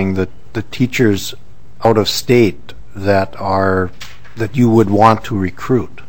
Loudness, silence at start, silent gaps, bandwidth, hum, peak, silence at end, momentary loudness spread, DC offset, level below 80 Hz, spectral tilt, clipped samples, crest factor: -15 LUFS; 0 s; none; 17.5 kHz; none; 0 dBFS; 0.1 s; 14 LU; 5%; -42 dBFS; -6 dB/octave; 0.3%; 16 dB